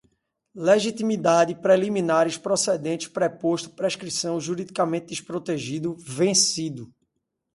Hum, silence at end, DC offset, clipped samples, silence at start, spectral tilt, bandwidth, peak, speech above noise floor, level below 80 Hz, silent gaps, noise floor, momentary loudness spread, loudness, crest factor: none; 0.7 s; under 0.1%; under 0.1%; 0.55 s; -3.5 dB/octave; 11.5 kHz; -6 dBFS; 55 dB; -68 dBFS; none; -79 dBFS; 10 LU; -23 LUFS; 18 dB